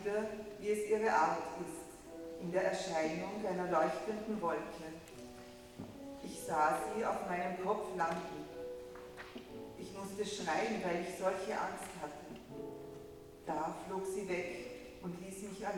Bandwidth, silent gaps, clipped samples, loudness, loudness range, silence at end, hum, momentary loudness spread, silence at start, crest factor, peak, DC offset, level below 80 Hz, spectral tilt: 19 kHz; none; under 0.1%; -39 LUFS; 6 LU; 0 s; none; 16 LU; 0 s; 20 dB; -20 dBFS; under 0.1%; -66 dBFS; -4.5 dB/octave